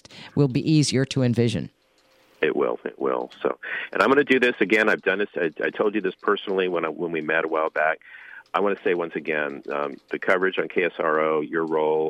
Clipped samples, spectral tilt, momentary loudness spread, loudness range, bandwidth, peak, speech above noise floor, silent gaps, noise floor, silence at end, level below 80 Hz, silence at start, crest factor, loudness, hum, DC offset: under 0.1%; -5.5 dB/octave; 9 LU; 4 LU; 11 kHz; -4 dBFS; 38 dB; none; -60 dBFS; 0 s; -64 dBFS; 0.1 s; 18 dB; -23 LUFS; none; under 0.1%